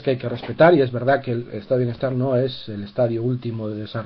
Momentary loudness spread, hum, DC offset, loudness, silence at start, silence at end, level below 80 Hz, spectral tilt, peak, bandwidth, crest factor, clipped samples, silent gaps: 13 LU; none; under 0.1%; -21 LUFS; 0 s; 0 s; -56 dBFS; -10 dB/octave; -2 dBFS; 5.6 kHz; 18 dB; under 0.1%; none